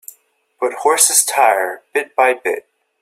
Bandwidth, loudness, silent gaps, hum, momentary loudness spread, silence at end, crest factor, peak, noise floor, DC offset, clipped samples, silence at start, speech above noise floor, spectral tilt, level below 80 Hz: 16.5 kHz; -15 LUFS; none; none; 12 LU; 0.4 s; 18 dB; 0 dBFS; -55 dBFS; under 0.1%; under 0.1%; 0.6 s; 39 dB; 1.5 dB/octave; -70 dBFS